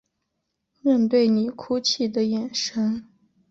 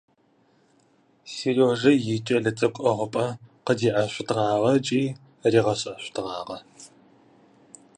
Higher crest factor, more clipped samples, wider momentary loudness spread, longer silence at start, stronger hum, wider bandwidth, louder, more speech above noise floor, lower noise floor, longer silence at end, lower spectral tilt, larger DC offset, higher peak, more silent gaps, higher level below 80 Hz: second, 14 dB vs 20 dB; neither; second, 7 LU vs 12 LU; second, 0.85 s vs 1.25 s; neither; second, 7.8 kHz vs 10.5 kHz; about the same, -23 LUFS vs -24 LUFS; first, 56 dB vs 40 dB; first, -78 dBFS vs -63 dBFS; second, 0.45 s vs 1.1 s; about the same, -4.5 dB/octave vs -5.5 dB/octave; neither; second, -10 dBFS vs -6 dBFS; neither; about the same, -66 dBFS vs -64 dBFS